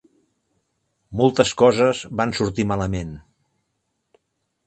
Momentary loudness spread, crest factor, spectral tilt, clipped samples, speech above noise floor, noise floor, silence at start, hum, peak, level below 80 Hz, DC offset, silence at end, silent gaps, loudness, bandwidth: 13 LU; 22 dB; -5.5 dB/octave; under 0.1%; 55 dB; -74 dBFS; 1.1 s; none; 0 dBFS; -46 dBFS; under 0.1%; 1.5 s; none; -20 LUFS; 9 kHz